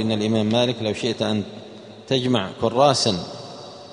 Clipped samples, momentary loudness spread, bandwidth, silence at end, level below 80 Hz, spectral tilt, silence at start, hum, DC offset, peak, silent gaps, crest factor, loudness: under 0.1%; 20 LU; 10.5 kHz; 0 s; -58 dBFS; -5 dB/octave; 0 s; none; under 0.1%; -2 dBFS; none; 20 dB; -21 LUFS